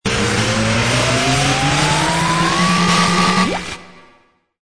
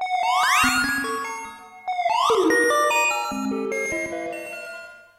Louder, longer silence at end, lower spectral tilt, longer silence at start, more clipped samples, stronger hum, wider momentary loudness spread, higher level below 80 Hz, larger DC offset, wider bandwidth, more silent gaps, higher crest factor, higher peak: first, -15 LUFS vs -21 LUFS; first, 0.65 s vs 0.2 s; first, -4 dB/octave vs -2 dB/octave; about the same, 0.05 s vs 0 s; neither; neither; second, 4 LU vs 16 LU; first, -36 dBFS vs -54 dBFS; first, 0.8% vs under 0.1%; second, 11 kHz vs 16 kHz; neither; about the same, 14 dB vs 16 dB; first, -2 dBFS vs -8 dBFS